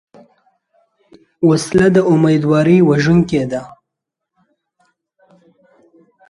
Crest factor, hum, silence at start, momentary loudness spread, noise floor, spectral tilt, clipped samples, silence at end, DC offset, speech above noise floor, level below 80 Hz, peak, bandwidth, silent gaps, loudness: 16 dB; none; 1.4 s; 7 LU; -80 dBFS; -7 dB/octave; under 0.1%; 2.6 s; under 0.1%; 68 dB; -46 dBFS; 0 dBFS; 11.5 kHz; none; -13 LUFS